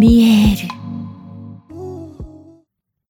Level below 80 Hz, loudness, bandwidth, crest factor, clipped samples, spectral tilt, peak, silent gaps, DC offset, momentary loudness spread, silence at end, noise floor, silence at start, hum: -30 dBFS; -13 LUFS; 17.5 kHz; 16 dB; under 0.1%; -6.5 dB/octave; 0 dBFS; none; under 0.1%; 26 LU; 0.8 s; -64 dBFS; 0 s; none